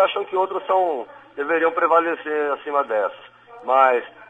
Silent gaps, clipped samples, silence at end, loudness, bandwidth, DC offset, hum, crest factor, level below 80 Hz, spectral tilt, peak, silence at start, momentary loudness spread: none; under 0.1%; 0.05 s; -21 LUFS; 7.8 kHz; under 0.1%; none; 18 dB; -74 dBFS; -5 dB/octave; -2 dBFS; 0 s; 12 LU